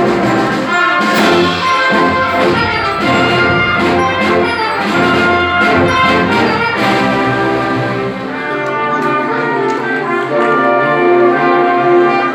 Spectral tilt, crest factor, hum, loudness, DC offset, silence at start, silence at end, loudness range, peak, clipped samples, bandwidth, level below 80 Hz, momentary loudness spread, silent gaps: -5.5 dB/octave; 12 dB; none; -12 LUFS; under 0.1%; 0 s; 0 s; 3 LU; 0 dBFS; under 0.1%; over 20 kHz; -42 dBFS; 5 LU; none